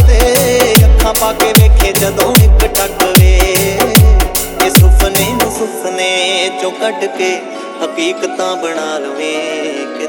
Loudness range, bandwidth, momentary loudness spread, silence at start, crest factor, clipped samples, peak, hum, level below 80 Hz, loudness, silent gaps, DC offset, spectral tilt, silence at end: 8 LU; over 20 kHz; 10 LU; 0 s; 10 dB; 0.7%; 0 dBFS; none; -14 dBFS; -11 LUFS; none; under 0.1%; -4.5 dB/octave; 0 s